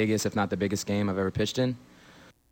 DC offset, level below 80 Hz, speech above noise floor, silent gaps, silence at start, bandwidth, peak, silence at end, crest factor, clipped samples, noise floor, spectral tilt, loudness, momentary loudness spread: under 0.1%; -58 dBFS; 27 dB; none; 0 s; 17 kHz; -16 dBFS; 0.25 s; 14 dB; under 0.1%; -54 dBFS; -5 dB/octave; -28 LUFS; 3 LU